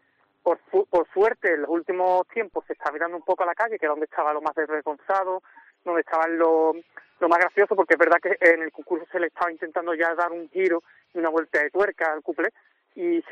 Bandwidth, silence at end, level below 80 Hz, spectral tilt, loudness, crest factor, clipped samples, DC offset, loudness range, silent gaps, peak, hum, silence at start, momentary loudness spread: 8.6 kHz; 0 s; -72 dBFS; -5.5 dB/octave; -24 LUFS; 18 dB; under 0.1%; under 0.1%; 5 LU; none; -6 dBFS; none; 0.45 s; 10 LU